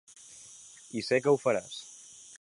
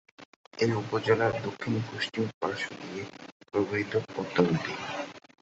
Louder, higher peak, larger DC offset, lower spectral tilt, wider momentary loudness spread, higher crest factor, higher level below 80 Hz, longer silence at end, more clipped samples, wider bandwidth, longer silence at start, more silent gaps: about the same, -29 LUFS vs -30 LUFS; second, -12 dBFS vs -8 dBFS; neither; second, -4.5 dB/octave vs -6 dB/octave; first, 22 LU vs 13 LU; about the same, 20 dB vs 22 dB; second, -74 dBFS vs -64 dBFS; second, 0.05 s vs 0.25 s; neither; first, 11.5 kHz vs 8.2 kHz; about the same, 0.3 s vs 0.2 s; second, none vs 0.25-0.51 s, 2.34-2.41 s, 3.32-3.40 s